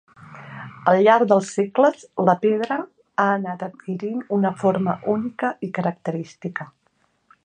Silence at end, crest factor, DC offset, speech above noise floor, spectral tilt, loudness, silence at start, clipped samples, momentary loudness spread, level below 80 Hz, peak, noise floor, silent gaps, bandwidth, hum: 0.8 s; 20 dB; under 0.1%; 46 dB; -6.5 dB/octave; -21 LUFS; 0.2 s; under 0.1%; 15 LU; -70 dBFS; -2 dBFS; -66 dBFS; none; 9.6 kHz; none